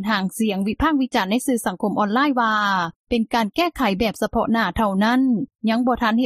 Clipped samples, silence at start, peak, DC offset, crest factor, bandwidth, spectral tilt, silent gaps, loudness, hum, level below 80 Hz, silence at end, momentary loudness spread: under 0.1%; 0 s; -6 dBFS; under 0.1%; 16 dB; 15.5 kHz; -5 dB/octave; 2.96-3.05 s; -20 LUFS; none; -42 dBFS; 0 s; 4 LU